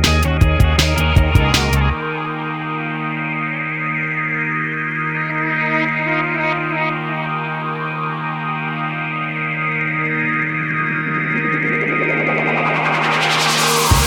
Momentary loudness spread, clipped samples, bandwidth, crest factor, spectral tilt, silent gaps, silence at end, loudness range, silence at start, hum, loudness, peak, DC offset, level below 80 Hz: 8 LU; under 0.1%; over 20 kHz; 18 dB; -4.5 dB/octave; none; 0 s; 4 LU; 0 s; none; -17 LUFS; 0 dBFS; under 0.1%; -26 dBFS